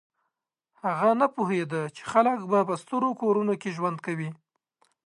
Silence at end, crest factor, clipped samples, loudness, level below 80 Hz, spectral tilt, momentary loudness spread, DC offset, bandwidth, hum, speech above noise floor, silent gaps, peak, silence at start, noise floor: 0.7 s; 20 dB; under 0.1%; -26 LUFS; -74 dBFS; -7 dB/octave; 9 LU; under 0.1%; 11.5 kHz; none; 57 dB; none; -8 dBFS; 0.85 s; -83 dBFS